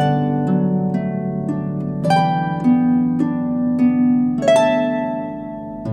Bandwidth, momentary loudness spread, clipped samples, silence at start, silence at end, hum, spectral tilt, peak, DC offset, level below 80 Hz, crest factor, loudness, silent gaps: 9.6 kHz; 9 LU; under 0.1%; 0 s; 0 s; none; -7.5 dB/octave; -2 dBFS; under 0.1%; -50 dBFS; 14 dB; -18 LUFS; none